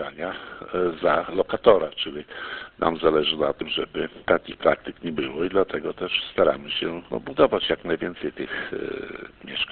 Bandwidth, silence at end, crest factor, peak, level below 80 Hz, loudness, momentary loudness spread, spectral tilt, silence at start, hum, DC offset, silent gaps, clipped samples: 4.5 kHz; 0 s; 24 dB; -2 dBFS; -52 dBFS; -25 LUFS; 12 LU; -9 dB/octave; 0 s; none; under 0.1%; none; under 0.1%